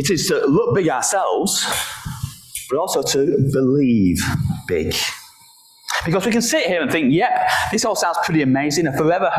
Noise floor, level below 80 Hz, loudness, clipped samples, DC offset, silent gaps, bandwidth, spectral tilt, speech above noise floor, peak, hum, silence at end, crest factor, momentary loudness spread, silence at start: -49 dBFS; -42 dBFS; -18 LUFS; under 0.1%; under 0.1%; none; 16 kHz; -4 dB/octave; 31 dB; -6 dBFS; none; 0 s; 12 dB; 8 LU; 0 s